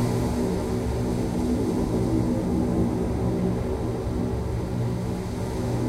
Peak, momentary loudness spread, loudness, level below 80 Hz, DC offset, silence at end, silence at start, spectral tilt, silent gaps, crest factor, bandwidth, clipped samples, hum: -12 dBFS; 4 LU; -26 LUFS; -34 dBFS; under 0.1%; 0 s; 0 s; -7.5 dB/octave; none; 12 dB; 15 kHz; under 0.1%; none